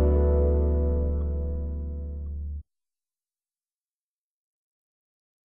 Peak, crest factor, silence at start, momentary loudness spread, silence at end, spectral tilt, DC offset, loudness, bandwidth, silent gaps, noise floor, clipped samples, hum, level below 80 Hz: -12 dBFS; 16 dB; 0 s; 13 LU; 2.9 s; -13 dB/octave; under 0.1%; -27 LUFS; 1.9 kHz; none; under -90 dBFS; under 0.1%; none; -30 dBFS